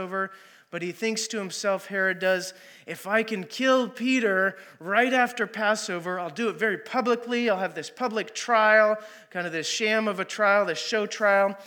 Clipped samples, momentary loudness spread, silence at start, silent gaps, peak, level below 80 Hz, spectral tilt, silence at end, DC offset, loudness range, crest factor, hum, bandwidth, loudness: under 0.1%; 10 LU; 0 s; none; -6 dBFS; under -90 dBFS; -3.5 dB/octave; 0 s; under 0.1%; 4 LU; 20 dB; none; 19 kHz; -25 LUFS